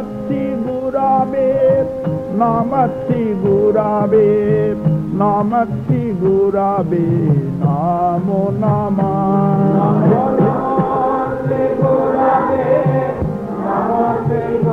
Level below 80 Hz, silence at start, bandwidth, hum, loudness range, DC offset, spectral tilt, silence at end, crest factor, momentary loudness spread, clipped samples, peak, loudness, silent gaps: -42 dBFS; 0 s; 5 kHz; none; 1 LU; under 0.1%; -10.5 dB/octave; 0 s; 12 dB; 6 LU; under 0.1%; -2 dBFS; -15 LUFS; none